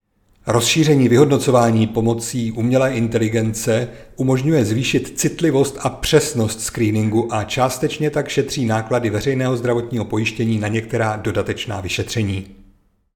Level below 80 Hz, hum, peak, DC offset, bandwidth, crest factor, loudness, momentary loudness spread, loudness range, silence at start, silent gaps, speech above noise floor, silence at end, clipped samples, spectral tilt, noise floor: -44 dBFS; none; 0 dBFS; under 0.1%; 19 kHz; 18 dB; -18 LUFS; 8 LU; 4 LU; 0.45 s; none; 36 dB; 0.6 s; under 0.1%; -5.5 dB/octave; -54 dBFS